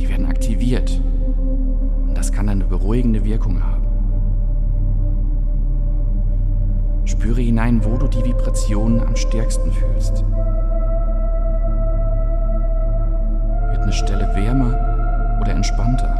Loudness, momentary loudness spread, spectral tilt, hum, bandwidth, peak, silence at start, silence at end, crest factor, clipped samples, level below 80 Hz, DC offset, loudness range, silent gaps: -21 LUFS; 4 LU; -7 dB/octave; none; 10 kHz; -4 dBFS; 0 s; 0 s; 12 dB; under 0.1%; -16 dBFS; under 0.1%; 2 LU; none